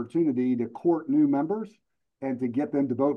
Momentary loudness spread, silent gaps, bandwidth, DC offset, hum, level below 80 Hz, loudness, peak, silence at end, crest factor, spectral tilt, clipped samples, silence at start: 10 LU; none; 3.9 kHz; under 0.1%; none; -76 dBFS; -27 LUFS; -12 dBFS; 0 s; 14 dB; -10 dB/octave; under 0.1%; 0 s